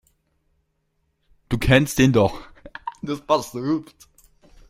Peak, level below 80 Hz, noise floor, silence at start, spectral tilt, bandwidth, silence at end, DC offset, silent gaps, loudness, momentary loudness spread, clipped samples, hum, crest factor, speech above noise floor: -2 dBFS; -40 dBFS; -71 dBFS; 1.5 s; -5.5 dB/octave; 16.5 kHz; 0.85 s; under 0.1%; none; -21 LUFS; 19 LU; under 0.1%; none; 22 dB; 51 dB